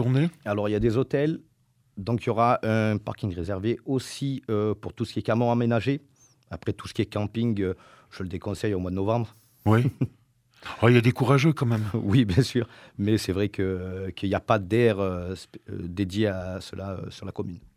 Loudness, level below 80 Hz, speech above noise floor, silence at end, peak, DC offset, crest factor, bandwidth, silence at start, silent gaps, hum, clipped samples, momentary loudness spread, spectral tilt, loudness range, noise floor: -26 LUFS; -52 dBFS; 32 dB; 0.15 s; -4 dBFS; under 0.1%; 22 dB; 14.5 kHz; 0 s; none; none; under 0.1%; 14 LU; -7 dB/octave; 5 LU; -57 dBFS